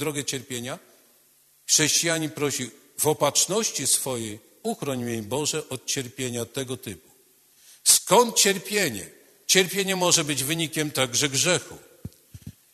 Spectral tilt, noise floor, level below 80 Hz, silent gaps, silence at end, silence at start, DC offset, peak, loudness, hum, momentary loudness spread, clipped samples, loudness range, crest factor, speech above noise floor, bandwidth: -2 dB/octave; -60 dBFS; -64 dBFS; none; 0.25 s; 0 s; under 0.1%; -2 dBFS; -23 LUFS; none; 17 LU; under 0.1%; 7 LU; 24 dB; 35 dB; 13.5 kHz